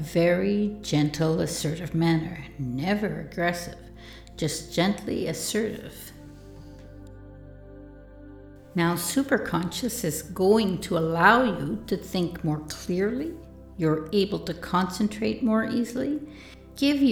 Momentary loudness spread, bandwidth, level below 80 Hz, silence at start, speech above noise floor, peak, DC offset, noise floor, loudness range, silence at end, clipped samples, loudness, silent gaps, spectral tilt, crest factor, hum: 24 LU; 19.5 kHz; -50 dBFS; 0 s; 20 dB; -4 dBFS; under 0.1%; -46 dBFS; 8 LU; 0 s; under 0.1%; -26 LUFS; none; -5 dB/octave; 22 dB; none